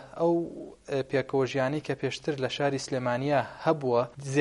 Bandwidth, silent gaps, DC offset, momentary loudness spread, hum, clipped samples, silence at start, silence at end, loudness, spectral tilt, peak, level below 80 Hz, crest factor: 11.5 kHz; none; under 0.1%; 5 LU; none; under 0.1%; 0 s; 0 s; -29 LUFS; -6 dB/octave; -10 dBFS; -62 dBFS; 18 dB